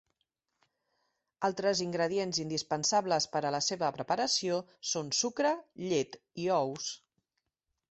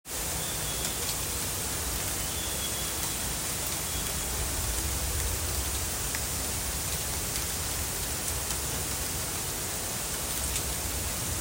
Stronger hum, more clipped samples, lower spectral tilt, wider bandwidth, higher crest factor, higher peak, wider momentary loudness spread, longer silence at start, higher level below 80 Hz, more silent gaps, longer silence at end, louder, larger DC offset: neither; neither; about the same, -3 dB/octave vs -2 dB/octave; second, 8.4 kHz vs 16.5 kHz; about the same, 18 dB vs 20 dB; second, -16 dBFS vs -12 dBFS; first, 7 LU vs 1 LU; first, 1.4 s vs 0.05 s; second, -74 dBFS vs -40 dBFS; neither; first, 0.95 s vs 0 s; about the same, -32 LUFS vs -30 LUFS; neither